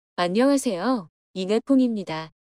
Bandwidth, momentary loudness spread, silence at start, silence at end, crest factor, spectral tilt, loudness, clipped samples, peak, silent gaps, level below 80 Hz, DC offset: 14.5 kHz; 12 LU; 0.2 s; 0.25 s; 14 dB; -5 dB/octave; -23 LUFS; under 0.1%; -10 dBFS; 1.09-1.34 s; -68 dBFS; under 0.1%